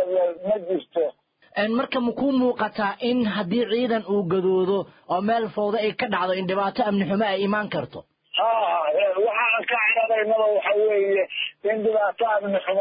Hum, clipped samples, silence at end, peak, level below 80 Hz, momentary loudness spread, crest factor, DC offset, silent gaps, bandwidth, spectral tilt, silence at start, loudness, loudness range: none; under 0.1%; 0 s; -10 dBFS; -64 dBFS; 6 LU; 14 dB; under 0.1%; none; 5.2 kHz; -10 dB/octave; 0 s; -23 LUFS; 3 LU